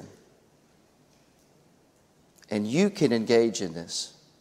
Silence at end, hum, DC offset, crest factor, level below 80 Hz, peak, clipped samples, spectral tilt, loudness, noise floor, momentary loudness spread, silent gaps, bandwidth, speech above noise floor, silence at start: 0.3 s; none; under 0.1%; 22 dB; -70 dBFS; -8 dBFS; under 0.1%; -5 dB/octave; -26 LUFS; -62 dBFS; 11 LU; none; 15 kHz; 37 dB; 0 s